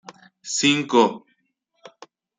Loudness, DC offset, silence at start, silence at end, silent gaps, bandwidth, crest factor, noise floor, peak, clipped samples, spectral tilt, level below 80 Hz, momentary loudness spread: -20 LUFS; under 0.1%; 0.45 s; 1.2 s; none; 9.6 kHz; 20 dB; -71 dBFS; -4 dBFS; under 0.1%; -3 dB/octave; -70 dBFS; 23 LU